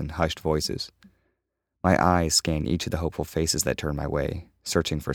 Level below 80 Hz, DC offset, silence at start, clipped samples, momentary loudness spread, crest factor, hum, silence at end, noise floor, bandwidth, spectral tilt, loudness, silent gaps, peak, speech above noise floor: -40 dBFS; under 0.1%; 0 s; under 0.1%; 9 LU; 22 dB; none; 0 s; -80 dBFS; 18.5 kHz; -4 dB/octave; -25 LUFS; none; -4 dBFS; 55 dB